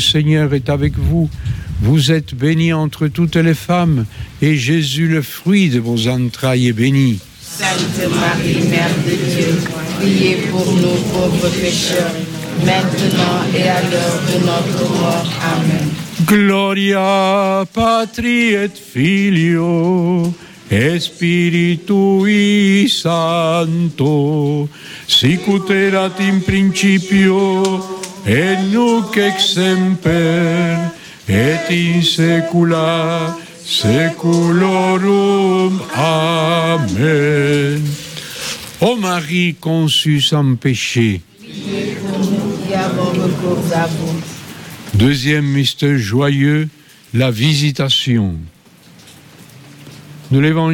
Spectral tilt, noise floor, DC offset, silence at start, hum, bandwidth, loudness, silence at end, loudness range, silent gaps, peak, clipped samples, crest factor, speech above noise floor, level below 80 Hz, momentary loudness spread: -5.5 dB/octave; -43 dBFS; under 0.1%; 0 s; none; 17.5 kHz; -14 LUFS; 0 s; 2 LU; none; -2 dBFS; under 0.1%; 12 dB; 30 dB; -38 dBFS; 8 LU